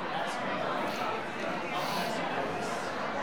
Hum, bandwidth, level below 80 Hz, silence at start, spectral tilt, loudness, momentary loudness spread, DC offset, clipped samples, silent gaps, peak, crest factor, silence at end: none; over 20 kHz; -70 dBFS; 0 s; -4 dB/octave; -33 LUFS; 2 LU; 0.5%; under 0.1%; none; -20 dBFS; 14 dB; 0 s